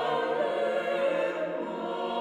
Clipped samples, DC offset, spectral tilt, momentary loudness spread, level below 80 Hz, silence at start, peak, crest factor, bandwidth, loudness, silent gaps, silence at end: under 0.1%; under 0.1%; -5 dB/octave; 5 LU; -74 dBFS; 0 s; -16 dBFS; 12 dB; 10 kHz; -29 LUFS; none; 0 s